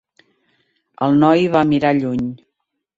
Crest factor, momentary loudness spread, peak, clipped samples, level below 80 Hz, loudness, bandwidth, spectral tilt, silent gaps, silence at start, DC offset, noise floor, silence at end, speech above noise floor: 16 dB; 10 LU; -2 dBFS; under 0.1%; -54 dBFS; -16 LUFS; 7.6 kHz; -8 dB/octave; none; 1 s; under 0.1%; -75 dBFS; 0.6 s; 60 dB